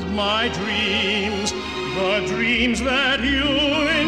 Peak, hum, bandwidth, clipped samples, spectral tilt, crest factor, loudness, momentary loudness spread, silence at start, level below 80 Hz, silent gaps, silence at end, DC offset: -8 dBFS; none; 14.5 kHz; under 0.1%; -3.5 dB/octave; 14 dB; -20 LUFS; 5 LU; 0 s; -38 dBFS; none; 0 s; 0.2%